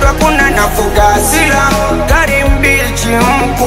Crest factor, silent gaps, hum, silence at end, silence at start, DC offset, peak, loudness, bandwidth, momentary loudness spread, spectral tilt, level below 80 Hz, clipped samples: 10 dB; none; none; 0 s; 0 s; under 0.1%; 0 dBFS; -9 LUFS; 16.5 kHz; 3 LU; -4 dB/octave; -16 dBFS; 0.2%